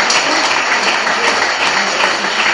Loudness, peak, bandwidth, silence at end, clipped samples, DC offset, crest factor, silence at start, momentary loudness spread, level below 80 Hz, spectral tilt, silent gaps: -12 LUFS; -2 dBFS; 11.5 kHz; 0 s; under 0.1%; 0.2%; 12 dB; 0 s; 2 LU; -56 dBFS; -0.5 dB/octave; none